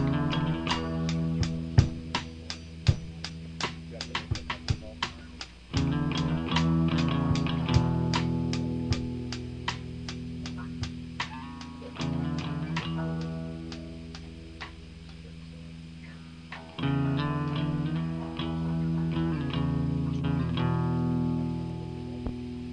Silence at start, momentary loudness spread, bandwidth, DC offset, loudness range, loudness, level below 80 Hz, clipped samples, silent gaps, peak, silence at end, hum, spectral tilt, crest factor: 0 s; 16 LU; 9.4 kHz; under 0.1%; 8 LU; -31 LUFS; -44 dBFS; under 0.1%; none; -6 dBFS; 0 s; none; -6.5 dB/octave; 24 dB